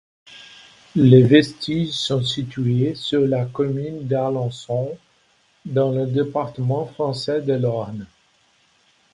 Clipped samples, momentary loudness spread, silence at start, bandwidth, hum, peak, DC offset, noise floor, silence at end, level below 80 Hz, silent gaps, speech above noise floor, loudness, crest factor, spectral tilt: under 0.1%; 13 LU; 0.3 s; 11 kHz; none; 0 dBFS; under 0.1%; -60 dBFS; 1.1 s; -56 dBFS; none; 41 dB; -20 LUFS; 20 dB; -7 dB/octave